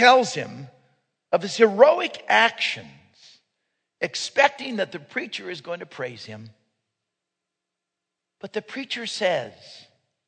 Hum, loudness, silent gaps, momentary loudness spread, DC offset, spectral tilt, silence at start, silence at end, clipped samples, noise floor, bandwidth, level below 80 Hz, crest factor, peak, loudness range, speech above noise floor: none; -23 LUFS; none; 19 LU; under 0.1%; -3 dB/octave; 0 s; 0.5 s; under 0.1%; -84 dBFS; 9.4 kHz; -80 dBFS; 24 dB; 0 dBFS; 15 LU; 62 dB